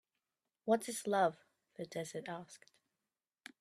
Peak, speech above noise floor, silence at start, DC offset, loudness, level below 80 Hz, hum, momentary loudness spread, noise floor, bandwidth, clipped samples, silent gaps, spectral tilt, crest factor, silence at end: -18 dBFS; over 53 dB; 0.65 s; under 0.1%; -38 LUFS; -84 dBFS; none; 23 LU; under -90 dBFS; 14.5 kHz; under 0.1%; none; -4.5 dB/octave; 22 dB; 1.05 s